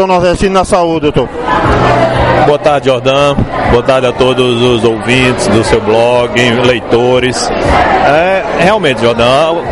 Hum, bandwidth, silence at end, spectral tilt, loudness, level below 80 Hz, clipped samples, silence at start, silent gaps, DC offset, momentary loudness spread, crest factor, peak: none; 11.5 kHz; 0 s; -5 dB/octave; -9 LUFS; -26 dBFS; 0.4%; 0 s; none; 0.5%; 3 LU; 8 dB; 0 dBFS